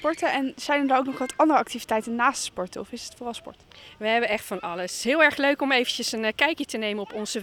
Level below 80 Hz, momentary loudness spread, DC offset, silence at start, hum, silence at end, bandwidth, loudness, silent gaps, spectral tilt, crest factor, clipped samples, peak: -62 dBFS; 14 LU; under 0.1%; 0 s; none; 0 s; 19 kHz; -24 LUFS; none; -2.5 dB/octave; 20 dB; under 0.1%; -6 dBFS